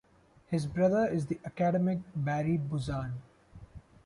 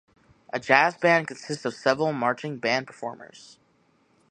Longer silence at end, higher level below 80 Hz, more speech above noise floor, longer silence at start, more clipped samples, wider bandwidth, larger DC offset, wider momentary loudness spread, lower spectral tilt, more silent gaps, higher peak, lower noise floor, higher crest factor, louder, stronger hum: second, 0.25 s vs 1.05 s; first, -56 dBFS vs -70 dBFS; second, 21 dB vs 40 dB; about the same, 0.5 s vs 0.55 s; neither; about the same, 11.5 kHz vs 10.5 kHz; neither; second, 10 LU vs 17 LU; first, -8 dB/octave vs -4.5 dB/octave; neither; second, -16 dBFS vs -2 dBFS; second, -51 dBFS vs -65 dBFS; second, 16 dB vs 24 dB; second, -31 LUFS vs -24 LUFS; neither